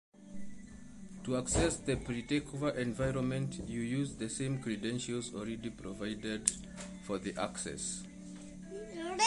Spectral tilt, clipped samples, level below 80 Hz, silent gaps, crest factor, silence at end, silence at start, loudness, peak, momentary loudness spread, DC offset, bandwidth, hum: -4.5 dB/octave; under 0.1%; -52 dBFS; none; 32 dB; 0 s; 0.15 s; -37 LUFS; -6 dBFS; 16 LU; under 0.1%; 11.5 kHz; none